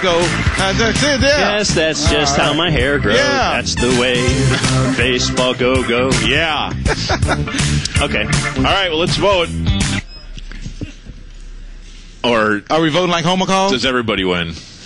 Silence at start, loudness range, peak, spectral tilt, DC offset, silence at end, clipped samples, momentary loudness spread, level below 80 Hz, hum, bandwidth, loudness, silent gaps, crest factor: 0 s; 6 LU; -2 dBFS; -4 dB/octave; under 0.1%; 0 s; under 0.1%; 6 LU; -28 dBFS; none; 11.5 kHz; -15 LUFS; none; 14 dB